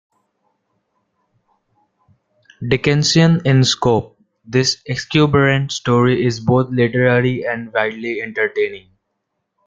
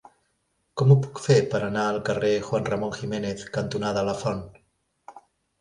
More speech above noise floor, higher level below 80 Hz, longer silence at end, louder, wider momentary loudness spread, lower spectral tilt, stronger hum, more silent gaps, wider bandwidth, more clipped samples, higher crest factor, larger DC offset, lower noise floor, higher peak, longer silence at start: first, 58 dB vs 49 dB; first, -50 dBFS vs -56 dBFS; first, 0.9 s vs 0.4 s; first, -16 LUFS vs -25 LUFS; about the same, 9 LU vs 11 LU; about the same, -5.5 dB/octave vs -6.5 dB/octave; neither; neither; second, 9.2 kHz vs 11 kHz; neither; about the same, 16 dB vs 20 dB; neither; about the same, -74 dBFS vs -72 dBFS; first, -2 dBFS vs -6 dBFS; first, 2.6 s vs 0.75 s